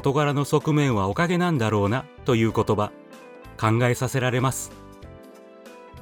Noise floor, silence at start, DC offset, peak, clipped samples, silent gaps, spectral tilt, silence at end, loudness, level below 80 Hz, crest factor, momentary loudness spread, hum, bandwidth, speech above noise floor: -46 dBFS; 0 s; under 0.1%; -6 dBFS; under 0.1%; none; -6 dB/octave; 0 s; -23 LUFS; -52 dBFS; 18 dB; 17 LU; none; 18.5 kHz; 24 dB